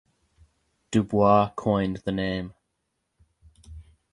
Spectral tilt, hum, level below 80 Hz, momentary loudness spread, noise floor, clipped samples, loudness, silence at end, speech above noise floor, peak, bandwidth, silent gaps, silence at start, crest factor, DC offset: -7 dB/octave; none; -50 dBFS; 11 LU; -78 dBFS; under 0.1%; -24 LUFS; 0.3 s; 55 dB; -6 dBFS; 11 kHz; none; 0.9 s; 22 dB; under 0.1%